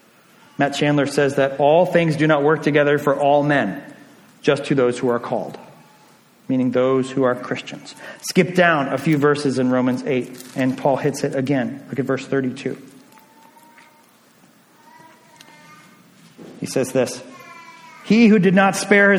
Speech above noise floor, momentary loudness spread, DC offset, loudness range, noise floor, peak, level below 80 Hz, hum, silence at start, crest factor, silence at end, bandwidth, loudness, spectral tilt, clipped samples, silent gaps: 35 dB; 18 LU; under 0.1%; 11 LU; -53 dBFS; -2 dBFS; -64 dBFS; none; 0.6 s; 18 dB; 0 s; 17.5 kHz; -18 LUFS; -6 dB/octave; under 0.1%; none